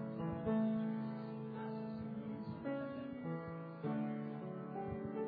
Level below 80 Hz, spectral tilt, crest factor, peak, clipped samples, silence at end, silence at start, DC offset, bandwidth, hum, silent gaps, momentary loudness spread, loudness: -68 dBFS; -8 dB/octave; 14 dB; -28 dBFS; under 0.1%; 0 s; 0 s; under 0.1%; 4.9 kHz; none; none; 8 LU; -43 LUFS